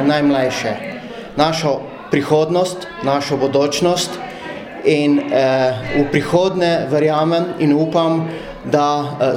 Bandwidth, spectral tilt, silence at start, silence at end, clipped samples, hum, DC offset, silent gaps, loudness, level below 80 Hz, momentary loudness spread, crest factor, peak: 15.5 kHz; -5.5 dB/octave; 0 s; 0 s; under 0.1%; none; under 0.1%; none; -17 LUFS; -48 dBFS; 11 LU; 16 dB; 0 dBFS